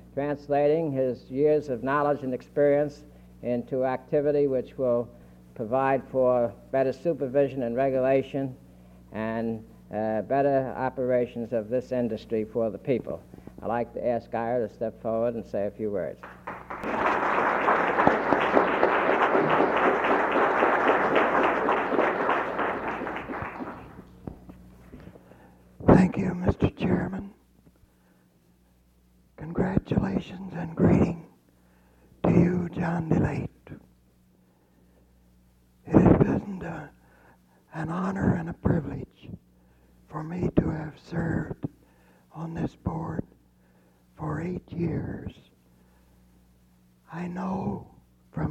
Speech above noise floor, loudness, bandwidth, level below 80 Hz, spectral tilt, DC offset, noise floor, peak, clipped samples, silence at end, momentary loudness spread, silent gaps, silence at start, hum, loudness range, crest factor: 35 dB; -26 LUFS; 8.8 kHz; -48 dBFS; -8.5 dB/octave; under 0.1%; -62 dBFS; -2 dBFS; under 0.1%; 0 s; 16 LU; none; 0.05 s; 60 Hz at -55 dBFS; 12 LU; 26 dB